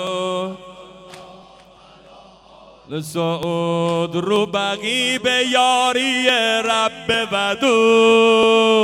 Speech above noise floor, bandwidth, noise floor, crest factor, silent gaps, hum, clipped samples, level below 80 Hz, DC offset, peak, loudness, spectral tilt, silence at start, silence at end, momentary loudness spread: 30 dB; 15 kHz; -46 dBFS; 16 dB; none; none; under 0.1%; -58 dBFS; under 0.1%; -2 dBFS; -17 LUFS; -3.5 dB/octave; 0 s; 0 s; 11 LU